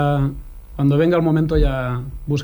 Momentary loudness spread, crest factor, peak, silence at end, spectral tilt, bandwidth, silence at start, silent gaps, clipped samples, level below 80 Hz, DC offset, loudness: 11 LU; 14 dB; -4 dBFS; 0 s; -8.5 dB/octave; over 20 kHz; 0 s; none; under 0.1%; -26 dBFS; under 0.1%; -19 LUFS